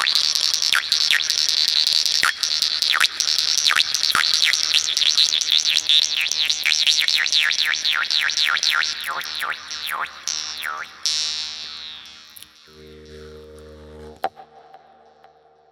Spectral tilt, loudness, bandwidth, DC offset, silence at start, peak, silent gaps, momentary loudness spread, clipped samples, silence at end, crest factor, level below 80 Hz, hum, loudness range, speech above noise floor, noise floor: 2.5 dB/octave; -17 LUFS; over 20 kHz; under 0.1%; 0 s; 0 dBFS; none; 12 LU; under 0.1%; 1.1 s; 22 dB; -58 dBFS; none; 18 LU; 25 dB; -52 dBFS